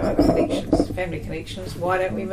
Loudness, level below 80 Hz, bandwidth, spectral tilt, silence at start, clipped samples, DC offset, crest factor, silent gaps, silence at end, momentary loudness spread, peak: -23 LUFS; -36 dBFS; 15 kHz; -6.5 dB/octave; 0 s; under 0.1%; under 0.1%; 16 dB; none; 0 s; 12 LU; -6 dBFS